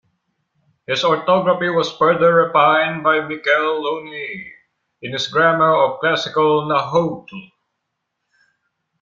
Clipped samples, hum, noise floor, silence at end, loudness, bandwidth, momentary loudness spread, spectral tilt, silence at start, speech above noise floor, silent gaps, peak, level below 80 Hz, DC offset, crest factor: under 0.1%; none; -76 dBFS; 1.55 s; -17 LUFS; 7.6 kHz; 15 LU; -5 dB/octave; 0.9 s; 59 dB; none; -2 dBFS; -62 dBFS; under 0.1%; 16 dB